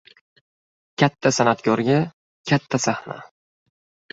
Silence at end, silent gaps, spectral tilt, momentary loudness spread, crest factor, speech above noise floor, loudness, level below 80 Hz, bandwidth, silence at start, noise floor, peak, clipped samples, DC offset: 0.85 s; 2.13-2.44 s; -5 dB/octave; 18 LU; 22 dB; over 70 dB; -21 LUFS; -60 dBFS; 8 kHz; 1 s; under -90 dBFS; -2 dBFS; under 0.1%; under 0.1%